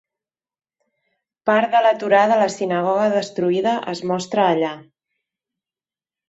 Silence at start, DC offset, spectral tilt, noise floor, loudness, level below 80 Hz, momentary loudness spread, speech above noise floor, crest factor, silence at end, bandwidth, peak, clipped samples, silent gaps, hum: 1.45 s; under 0.1%; -5 dB/octave; under -90 dBFS; -19 LUFS; -68 dBFS; 9 LU; over 72 dB; 18 dB; 1.45 s; 8 kHz; -2 dBFS; under 0.1%; none; none